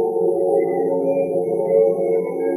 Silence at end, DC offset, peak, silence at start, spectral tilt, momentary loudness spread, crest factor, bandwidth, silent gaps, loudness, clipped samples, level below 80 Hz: 0 s; under 0.1%; -6 dBFS; 0 s; -10.5 dB/octave; 4 LU; 14 dB; 12 kHz; none; -19 LUFS; under 0.1%; -70 dBFS